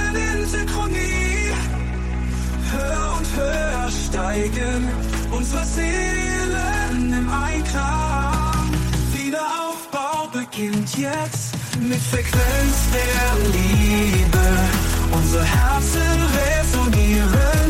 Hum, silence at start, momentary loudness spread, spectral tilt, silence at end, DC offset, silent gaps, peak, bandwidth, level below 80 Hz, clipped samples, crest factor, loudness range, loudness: none; 0 s; 7 LU; -5 dB/octave; 0 s; under 0.1%; none; -6 dBFS; 16.5 kHz; -22 dBFS; under 0.1%; 12 dB; 5 LU; -21 LUFS